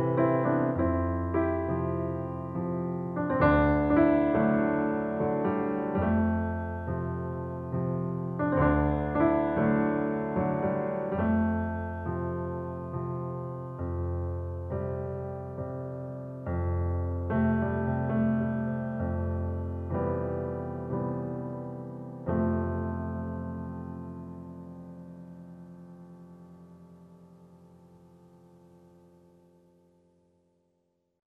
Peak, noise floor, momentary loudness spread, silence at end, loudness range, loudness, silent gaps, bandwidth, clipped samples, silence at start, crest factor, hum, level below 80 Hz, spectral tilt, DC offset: -10 dBFS; -75 dBFS; 15 LU; 3.75 s; 12 LU; -30 LUFS; none; 4.4 kHz; under 0.1%; 0 s; 20 dB; none; -46 dBFS; -11 dB/octave; under 0.1%